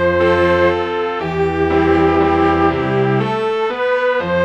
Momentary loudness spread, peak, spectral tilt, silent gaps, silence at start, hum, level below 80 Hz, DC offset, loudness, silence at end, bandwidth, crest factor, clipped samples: 5 LU; 0 dBFS; -7.5 dB/octave; none; 0 s; none; -36 dBFS; under 0.1%; -15 LUFS; 0 s; 8.4 kHz; 14 dB; under 0.1%